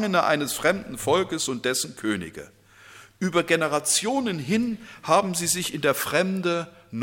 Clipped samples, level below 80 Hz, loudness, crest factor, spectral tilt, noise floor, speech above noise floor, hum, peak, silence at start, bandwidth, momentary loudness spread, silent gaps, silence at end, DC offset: under 0.1%; -60 dBFS; -24 LUFS; 20 dB; -3.5 dB/octave; -49 dBFS; 25 dB; none; -6 dBFS; 0 s; 17 kHz; 8 LU; none; 0 s; under 0.1%